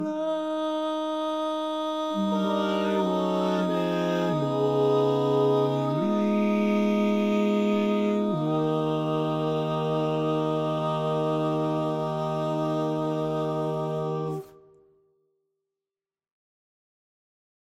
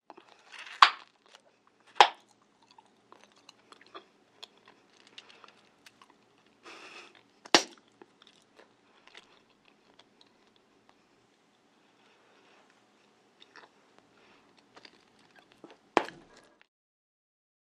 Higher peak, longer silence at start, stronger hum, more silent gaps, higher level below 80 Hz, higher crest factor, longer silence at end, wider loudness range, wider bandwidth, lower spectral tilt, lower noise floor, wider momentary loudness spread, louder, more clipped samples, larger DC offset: second, -12 dBFS vs 0 dBFS; second, 0 s vs 0.8 s; neither; neither; first, -72 dBFS vs -84 dBFS; second, 14 dB vs 36 dB; first, 3.15 s vs 1.65 s; second, 7 LU vs 25 LU; about the same, 13 kHz vs 13 kHz; first, -7.5 dB/octave vs -0.5 dB/octave; first, under -90 dBFS vs -67 dBFS; second, 5 LU vs 32 LU; about the same, -26 LUFS vs -26 LUFS; neither; neither